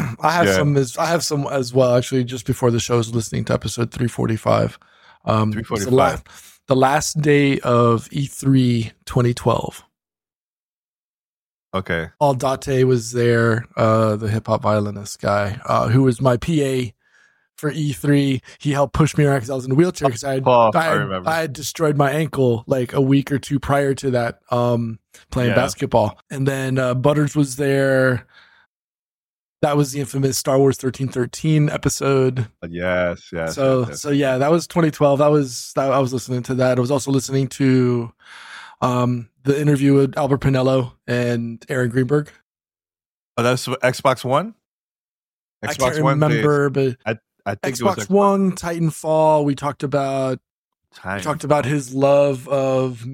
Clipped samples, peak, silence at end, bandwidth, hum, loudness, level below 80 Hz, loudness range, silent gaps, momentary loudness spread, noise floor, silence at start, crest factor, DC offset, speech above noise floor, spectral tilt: under 0.1%; -2 dBFS; 0 s; 17 kHz; none; -19 LUFS; -48 dBFS; 4 LU; 10.35-11.69 s, 28.66-29.54 s, 42.42-42.55 s, 43.06-43.35 s, 44.65-45.60 s, 50.50-50.69 s; 8 LU; under -90 dBFS; 0 s; 18 dB; under 0.1%; over 72 dB; -6 dB/octave